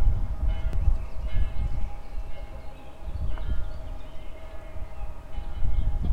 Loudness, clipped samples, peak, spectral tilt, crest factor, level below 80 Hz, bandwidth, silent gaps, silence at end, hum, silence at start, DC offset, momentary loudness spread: -34 LUFS; under 0.1%; -8 dBFS; -7.5 dB/octave; 16 dB; -28 dBFS; 4.5 kHz; none; 0 s; none; 0 s; under 0.1%; 14 LU